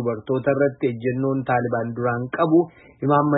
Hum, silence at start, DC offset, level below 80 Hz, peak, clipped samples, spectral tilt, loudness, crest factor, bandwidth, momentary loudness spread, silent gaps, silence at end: none; 0 s; under 0.1%; -60 dBFS; -6 dBFS; under 0.1%; -12.5 dB/octave; -22 LUFS; 16 dB; 4 kHz; 6 LU; none; 0 s